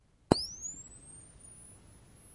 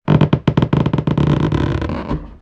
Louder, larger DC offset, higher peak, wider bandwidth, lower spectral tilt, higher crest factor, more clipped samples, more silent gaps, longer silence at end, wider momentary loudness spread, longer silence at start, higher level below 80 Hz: second, -34 LUFS vs -17 LUFS; neither; about the same, -2 dBFS vs 0 dBFS; first, 11.5 kHz vs 6.8 kHz; second, -4.5 dB/octave vs -9 dB/octave; first, 36 dB vs 16 dB; neither; neither; about the same, 0 s vs 0.05 s; first, 23 LU vs 8 LU; first, 0.3 s vs 0.05 s; second, -56 dBFS vs -30 dBFS